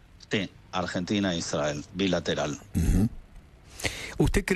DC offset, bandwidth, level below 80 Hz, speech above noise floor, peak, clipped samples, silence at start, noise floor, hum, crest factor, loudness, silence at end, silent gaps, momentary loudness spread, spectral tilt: under 0.1%; 13.5 kHz; -36 dBFS; 23 dB; -8 dBFS; under 0.1%; 0.2 s; -50 dBFS; none; 20 dB; -29 LUFS; 0 s; none; 6 LU; -5 dB/octave